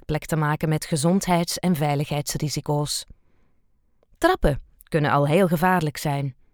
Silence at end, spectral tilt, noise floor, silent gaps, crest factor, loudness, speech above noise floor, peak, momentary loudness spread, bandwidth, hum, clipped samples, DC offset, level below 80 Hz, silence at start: 0.2 s; -5.5 dB/octave; -62 dBFS; none; 20 dB; -23 LUFS; 40 dB; -4 dBFS; 7 LU; over 20 kHz; none; under 0.1%; under 0.1%; -40 dBFS; 0.1 s